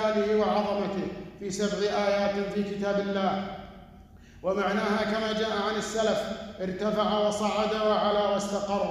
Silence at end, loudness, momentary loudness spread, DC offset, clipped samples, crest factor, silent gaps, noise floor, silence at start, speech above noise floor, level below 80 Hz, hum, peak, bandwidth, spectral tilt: 0 s; -28 LUFS; 10 LU; under 0.1%; under 0.1%; 14 dB; none; -50 dBFS; 0 s; 23 dB; -54 dBFS; none; -14 dBFS; 13.5 kHz; -5 dB/octave